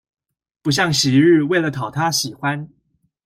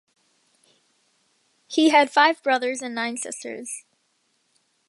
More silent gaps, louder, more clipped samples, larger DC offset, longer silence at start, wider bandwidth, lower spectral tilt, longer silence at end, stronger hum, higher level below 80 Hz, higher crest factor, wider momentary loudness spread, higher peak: neither; first, -17 LUFS vs -21 LUFS; neither; neither; second, 0.65 s vs 1.7 s; first, 16 kHz vs 11.5 kHz; first, -4.5 dB/octave vs -1.5 dB/octave; second, 0.6 s vs 1.1 s; neither; first, -56 dBFS vs -84 dBFS; second, 16 dB vs 22 dB; second, 10 LU vs 17 LU; about the same, -4 dBFS vs -2 dBFS